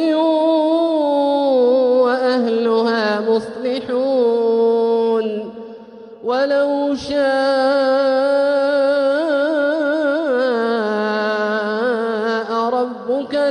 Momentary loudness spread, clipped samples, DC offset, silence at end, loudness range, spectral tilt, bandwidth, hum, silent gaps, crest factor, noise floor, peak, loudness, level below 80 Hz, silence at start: 5 LU; under 0.1%; under 0.1%; 0 s; 3 LU; -5.5 dB/octave; 10 kHz; none; none; 12 dB; -37 dBFS; -6 dBFS; -17 LUFS; -62 dBFS; 0 s